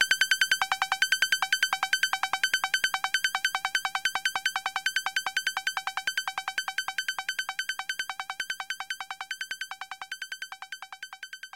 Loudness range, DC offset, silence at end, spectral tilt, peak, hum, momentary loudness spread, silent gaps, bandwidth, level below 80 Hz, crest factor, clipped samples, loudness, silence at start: 9 LU; under 0.1%; 0.1 s; 3 dB/octave; -10 dBFS; none; 13 LU; none; 17 kHz; -74 dBFS; 22 dB; under 0.1%; -28 LUFS; 0 s